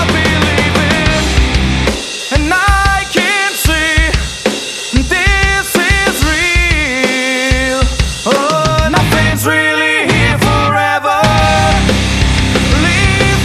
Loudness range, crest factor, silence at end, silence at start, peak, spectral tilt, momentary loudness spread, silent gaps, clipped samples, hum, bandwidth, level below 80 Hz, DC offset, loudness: 1 LU; 12 dB; 0 s; 0 s; 0 dBFS; -4 dB/octave; 4 LU; none; under 0.1%; none; 14 kHz; -18 dBFS; under 0.1%; -11 LUFS